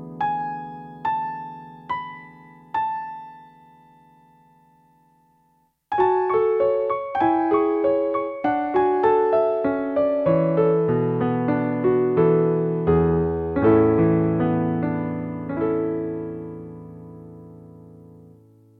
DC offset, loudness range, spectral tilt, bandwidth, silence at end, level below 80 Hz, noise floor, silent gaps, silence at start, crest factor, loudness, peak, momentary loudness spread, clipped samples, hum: under 0.1%; 13 LU; -11 dB/octave; 4.7 kHz; 0.85 s; -48 dBFS; -64 dBFS; none; 0 s; 16 dB; -22 LUFS; -6 dBFS; 18 LU; under 0.1%; none